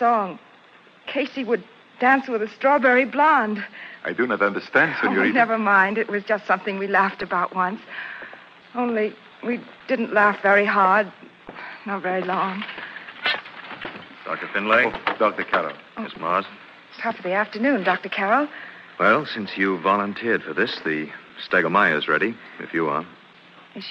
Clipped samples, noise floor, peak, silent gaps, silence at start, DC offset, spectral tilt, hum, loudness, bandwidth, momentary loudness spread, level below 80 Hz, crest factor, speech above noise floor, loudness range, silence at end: under 0.1%; -51 dBFS; -4 dBFS; none; 0 s; under 0.1%; -6.5 dB/octave; none; -21 LUFS; 8.4 kHz; 17 LU; -66 dBFS; 18 dB; 29 dB; 5 LU; 0 s